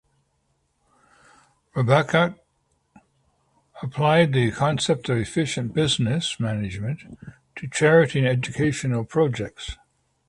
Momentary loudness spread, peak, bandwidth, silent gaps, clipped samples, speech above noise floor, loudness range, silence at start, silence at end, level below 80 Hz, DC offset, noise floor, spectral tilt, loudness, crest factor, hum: 17 LU; -2 dBFS; 11.5 kHz; none; under 0.1%; 48 dB; 4 LU; 1.75 s; 0.55 s; -50 dBFS; under 0.1%; -70 dBFS; -5.5 dB/octave; -22 LUFS; 22 dB; none